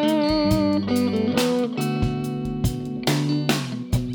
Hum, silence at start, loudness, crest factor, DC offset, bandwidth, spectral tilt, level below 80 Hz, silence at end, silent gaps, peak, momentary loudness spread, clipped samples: none; 0 s; -23 LUFS; 20 dB; under 0.1%; over 20 kHz; -6 dB/octave; -38 dBFS; 0 s; none; -2 dBFS; 6 LU; under 0.1%